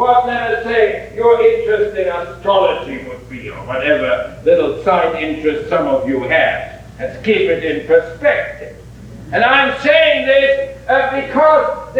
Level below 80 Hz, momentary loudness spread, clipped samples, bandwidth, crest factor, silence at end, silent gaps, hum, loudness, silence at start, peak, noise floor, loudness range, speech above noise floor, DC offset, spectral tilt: -42 dBFS; 15 LU; under 0.1%; 9.4 kHz; 14 dB; 0 s; none; none; -14 LUFS; 0 s; 0 dBFS; -34 dBFS; 3 LU; 20 dB; under 0.1%; -5.5 dB/octave